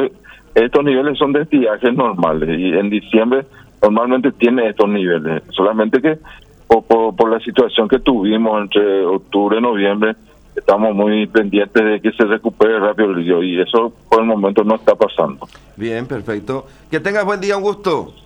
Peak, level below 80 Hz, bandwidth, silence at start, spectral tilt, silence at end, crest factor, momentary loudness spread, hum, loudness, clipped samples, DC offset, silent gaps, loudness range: 0 dBFS; -46 dBFS; 9.6 kHz; 0 s; -6.5 dB/octave; 0.15 s; 14 dB; 8 LU; none; -15 LUFS; under 0.1%; under 0.1%; none; 2 LU